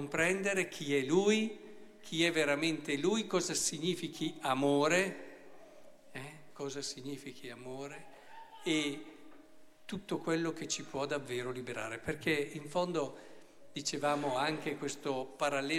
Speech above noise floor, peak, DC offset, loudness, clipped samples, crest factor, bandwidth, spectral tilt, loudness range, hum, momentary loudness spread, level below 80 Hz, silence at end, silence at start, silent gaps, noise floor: 20 dB; -16 dBFS; under 0.1%; -34 LUFS; under 0.1%; 20 dB; 16 kHz; -3.5 dB/octave; 9 LU; none; 18 LU; -72 dBFS; 0 s; 0 s; none; -55 dBFS